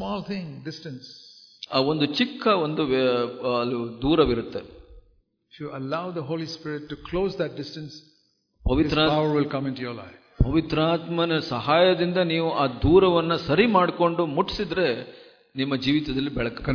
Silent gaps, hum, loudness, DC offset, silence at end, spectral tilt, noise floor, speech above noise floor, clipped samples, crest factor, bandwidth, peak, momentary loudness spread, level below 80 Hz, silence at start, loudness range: none; none; -24 LUFS; under 0.1%; 0 s; -7 dB/octave; -66 dBFS; 42 dB; under 0.1%; 20 dB; 5.4 kHz; -4 dBFS; 16 LU; -40 dBFS; 0 s; 10 LU